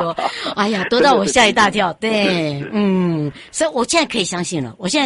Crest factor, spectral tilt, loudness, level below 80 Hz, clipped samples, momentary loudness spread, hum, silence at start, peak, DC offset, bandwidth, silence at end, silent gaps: 16 dB; -4 dB/octave; -17 LUFS; -50 dBFS; under 0.1%; 9 LU; none; 0 s; 0 dBFS; under 0.1%; 11.5 kHz; 0 s; none